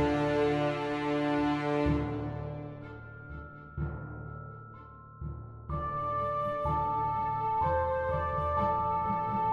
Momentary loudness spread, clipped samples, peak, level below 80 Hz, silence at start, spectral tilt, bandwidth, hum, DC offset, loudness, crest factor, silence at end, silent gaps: 16 LU; under 0.1%; -18 dBFS; -46 dBFS; 0 s; -8 dB/octave; 9.8 kHz; none; under 0.1%; -31 LUFS; 14 dB; 0 s; none